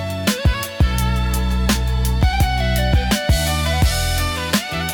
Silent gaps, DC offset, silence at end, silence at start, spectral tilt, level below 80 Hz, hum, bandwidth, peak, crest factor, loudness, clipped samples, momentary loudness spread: none; under 0.1%; 0 s; 0 s; -4.5 dB/octave; -20 dBFS; none; 19 kHz; -4 dBFS; 14 dB; -19 LUFS; under 0.1%; 3 LU